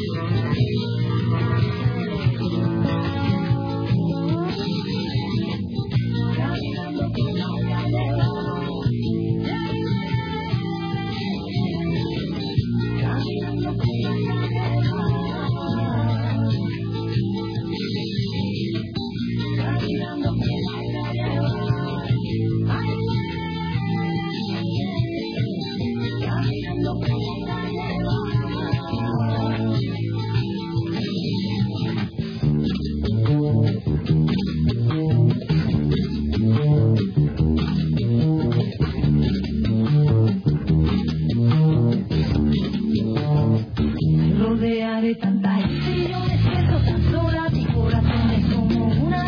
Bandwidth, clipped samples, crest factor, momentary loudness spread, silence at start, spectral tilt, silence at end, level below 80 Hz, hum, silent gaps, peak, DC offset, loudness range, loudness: 5.4 kHz; under 0.1%; 14 dB; 6 LU; 0 s; -9 dB/octave; 0 s; -36 dBFS; none; none; -6 dBFS; under 0.1%; 5 LU; -22 LUFS